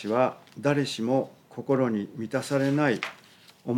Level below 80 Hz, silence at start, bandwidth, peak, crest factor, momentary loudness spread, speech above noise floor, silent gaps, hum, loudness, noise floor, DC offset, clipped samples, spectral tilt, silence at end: -78 dBFS; 0 s; 16 kHz; -10 dBFS; 18 dB; 11 LU; 27 dB; none; none; -27 LUFS; -53 dBFS; under 0.1%; under 0.1%; -6 dB/octave; 0 s